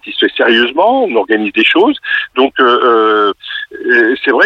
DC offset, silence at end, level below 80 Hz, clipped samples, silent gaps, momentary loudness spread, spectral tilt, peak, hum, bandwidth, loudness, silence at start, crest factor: under 0.1%; 0 s; -56 dBFS; under 0.1%; none; 6 LU; -5 dB/octave; -2 dBFS; none; 6.4 kHz; -10 LUFS; 0.05 s; 10 dB